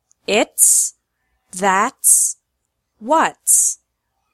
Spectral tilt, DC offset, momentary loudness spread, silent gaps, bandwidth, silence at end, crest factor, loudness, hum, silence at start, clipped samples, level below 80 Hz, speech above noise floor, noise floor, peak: -0.5 dB/octave; under 0.1%; 19 LU; none; 16.5 kHz; 0.6 s; 18 dB; -14 LUFS; none; 0.3 s; under 0.1%; -66 dBFS; 58 dB; -74 dBFS; 0 dBFS